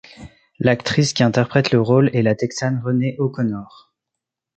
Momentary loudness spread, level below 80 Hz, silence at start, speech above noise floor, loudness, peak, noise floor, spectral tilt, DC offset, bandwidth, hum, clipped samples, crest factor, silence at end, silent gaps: 7 LU; -54 dBFS; 0.2 s; 65 dB; -18 LUFS; -2 dBFS; -83 dBFS; -6 dB/octave; under 0.1%; 8.8 kHz; none; under 0.1%; 18 dB; 0.9 s; none